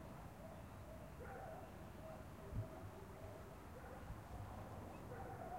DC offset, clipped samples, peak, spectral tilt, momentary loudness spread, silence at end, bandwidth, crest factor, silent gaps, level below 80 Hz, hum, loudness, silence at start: under 0.1%; under 0.1%; -36 dBFS; -6.5 dB/octave; 5 LU; 0 s; 16 kHz; 18 dB; none; -60 dBFS; none; -54 LUFS; 0 s